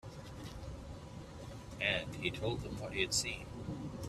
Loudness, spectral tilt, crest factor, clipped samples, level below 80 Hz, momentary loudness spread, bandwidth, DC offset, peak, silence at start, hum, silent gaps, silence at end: -38 LUFS; -3.5 dB/octave; 22 dB; under 0.1%; -54 dBFS; 16 LU; 15 kHz; under 0.1%; -18 dBFS; 0.05 s; none; none; 0 s